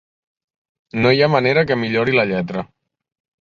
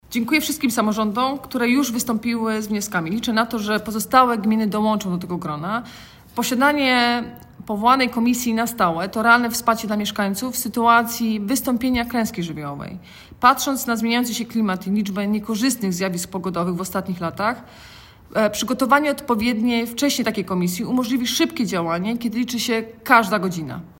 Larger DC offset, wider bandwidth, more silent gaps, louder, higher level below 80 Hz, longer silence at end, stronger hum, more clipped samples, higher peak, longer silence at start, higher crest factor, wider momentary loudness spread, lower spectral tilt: neither; second, 7.2 kHz vs 16.5 kHz; neither; first, -17 LUFS vs -20 LUFS; about the same, -52 dBFS vs -52 dBFS; first, 0.8 s vs 0.1 s; neither; neither; about the same, -2 dBFS vs 0 dBFS; first, 0.95 s vs 0.1 s; about the same, 18 dB vs 20 dB; first, 14 LU vs 10 LU; first, -7.5 dB/octave vs -4 dB/octave